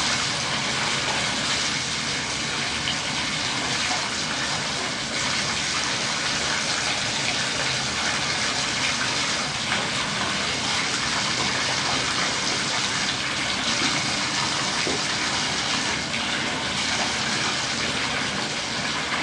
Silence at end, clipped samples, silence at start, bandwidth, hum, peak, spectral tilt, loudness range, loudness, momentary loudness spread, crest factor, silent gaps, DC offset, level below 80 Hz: 0 s; under 0.1%; 0 s; 11.5 kHz; none; -8 dBFS; -1.5 dB/octave; 1 LU; -23 LUFS; 2 LU; 16 dB; none; under 0.1%; -52 dBFS